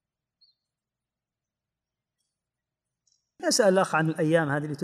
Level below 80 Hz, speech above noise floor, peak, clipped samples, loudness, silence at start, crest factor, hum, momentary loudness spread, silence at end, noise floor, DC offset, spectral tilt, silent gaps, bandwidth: -78 dBFS; 66 dB; -10 dBFS; under 0.1%; -24 LUFS; 3.4 s; 20 dB; none; 7 LU; 0 s; -89 dBFS; under 0.1%; -4.5 dB/octave; none; 15.5 kHz